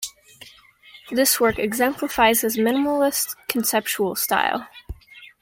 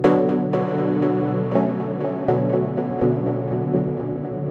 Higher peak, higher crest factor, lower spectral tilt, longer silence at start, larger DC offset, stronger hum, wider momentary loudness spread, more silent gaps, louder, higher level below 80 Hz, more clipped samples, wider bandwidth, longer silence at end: about the same, -2 dBFS vs -4 dBFS; about the same, 20 dB vs 16 dB; second, -2.5 dB/octave vs -10.5 dB/octave; about the same, 0 s vs 0 s; neither; neither; first, 16 LU vs 5 LU; neither; about the same, -20 LUFS vs -22 LUFS; first, -48 dBFS vs -54 dBFS; neither; first, 17 kHz vs 6.4 kHz; first, 0.15 s vs 0 s